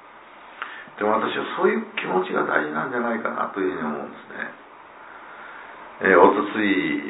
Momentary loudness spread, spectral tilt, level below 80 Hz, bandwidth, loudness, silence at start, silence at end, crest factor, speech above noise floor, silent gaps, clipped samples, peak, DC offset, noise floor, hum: 22 LU; -9 dB/octave; -68 dBFS; 4 kHz; -22 LUFS; 0.05 s; 0 s; 22 dB; 23 dB; none; under 0.1%; -2 dBFS; under 0.1%; -45 dBFS; none